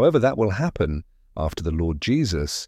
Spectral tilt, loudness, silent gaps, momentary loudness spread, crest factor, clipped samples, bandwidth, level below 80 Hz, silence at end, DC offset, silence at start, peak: -6 dB/octave; -23 LUFS; none; 9 LU; 16 dB; under 0.1%; 15 kHz; -34 dBFS; 0 s; under 0.1%; 0 s; -6 dBFS